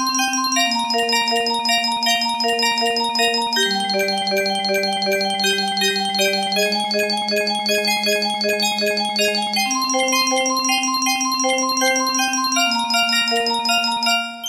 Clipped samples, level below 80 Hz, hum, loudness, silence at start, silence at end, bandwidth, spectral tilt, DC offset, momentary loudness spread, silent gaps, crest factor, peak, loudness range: under 0.1%; -64 dBFS; none; -18 LUFS; 0 s; 0 s; 16 kHz; -1 dB/octave; under 0.1%; 2 LU; none; 14 dB; -4 dBFS; 1 LU